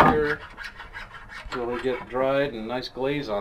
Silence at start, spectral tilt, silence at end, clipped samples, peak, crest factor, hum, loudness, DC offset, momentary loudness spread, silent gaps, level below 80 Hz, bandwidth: 0 s; -6.5 dB/octave; 0 s; under 0.1%; -4 dBFS; 22 dB; none; -27 LUFS; under 0.1%; 15 LU; none; -46 dBFS; 15.5 kHz